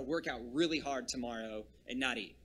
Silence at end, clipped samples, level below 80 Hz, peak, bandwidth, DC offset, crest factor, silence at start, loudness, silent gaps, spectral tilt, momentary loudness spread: 0.1 s; under 0.1%; -62 dBFS; -18 dBFS; 12.5 kHz; under 0.1%; 20 dB; 0 s; -37 LUFS; none; -3.5 dB/octave; 10 LU